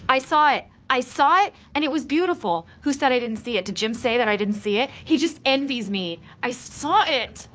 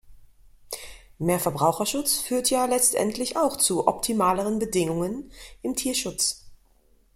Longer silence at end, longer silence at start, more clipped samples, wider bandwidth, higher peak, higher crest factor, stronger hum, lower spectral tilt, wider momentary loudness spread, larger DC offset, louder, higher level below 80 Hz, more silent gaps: second, 0.1 s vs 0.6 s; about the same, 0 s vs 0.05 s; neither; second, 8 kHz vs 16.5 kHz; about the same, -2 dBFS vs -4 dBFS; about the same, 20 dB vs 22 dB; neither; about the same, -4 dB/octave vs -3.5 dB/octave; second, 9 LU vs 16 LU; neither; about the same, -22 LUFS vs -24 LUFS; about the same, -56 dBFS vs -54 dBFS; neither